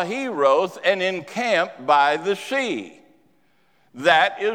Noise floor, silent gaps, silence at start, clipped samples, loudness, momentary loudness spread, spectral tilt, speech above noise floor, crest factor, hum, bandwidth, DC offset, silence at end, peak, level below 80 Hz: -63 dBFS; none; 0 s; under 0.1%; -20 LUFS; 8 LU; -3.5 dB/octave; 43 dB; 20 dB; none; 15.5 kHz; under 0.1%; 0 s; -2 dBFS; -76 dBFS